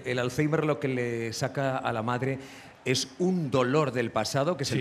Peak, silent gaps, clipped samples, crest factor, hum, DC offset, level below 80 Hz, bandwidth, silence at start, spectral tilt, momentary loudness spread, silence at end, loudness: -10 dBFS; none; under 0.1%; 18 dB; none; under 0.1%; -62 dBFS; 15 kHz; 0 s; -5 dB/octave; 5 LU; 0 s; -28 LUFS